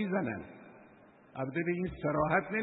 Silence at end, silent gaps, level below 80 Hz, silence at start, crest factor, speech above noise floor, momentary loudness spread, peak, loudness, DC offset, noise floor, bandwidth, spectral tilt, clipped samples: 0 s; none; -60 dBFS; 0 s; 20 dB; 26 dB; 19 LU; -14 dBFS; -34 LUFS; under 0.1%; -59 dBFS; 3.9 kHz; -3 dB/octave; under 0.1%